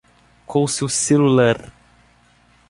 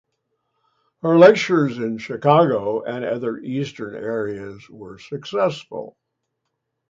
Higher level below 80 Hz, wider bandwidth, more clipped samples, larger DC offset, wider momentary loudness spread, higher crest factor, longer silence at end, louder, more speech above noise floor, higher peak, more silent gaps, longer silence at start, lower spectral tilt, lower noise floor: first, -54 dBFS vs -64 dBFS; first, 11.5 kHz vs 7.6 kHz; neither; neither; second, 9 LU vs 22 LU; about the same, 16 dB vs 20 dB; about the same, 1 s vs 1 s; about the same, -17 LUFS vs -19 LUFS; second, 38 dB vs 58 dB; second, -4 dBFS vs 0 dBFS; neither; second, 0.5 s vs 1.05 s; second, -5 dB/octave vs -6.5 dB/octave; second, -55 dBFS vs -77 dBFS